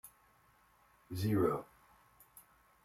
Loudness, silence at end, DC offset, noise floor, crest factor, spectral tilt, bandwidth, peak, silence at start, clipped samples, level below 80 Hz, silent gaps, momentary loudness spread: -36 LUFS; 0.45 s; under 0.1%; -69 dBFS; 22 dB; -7.5 dB/octave; 16 kHz; -20 dBFS; 0.05 s; under 0.1%; -70 dBFS; none; 27 LU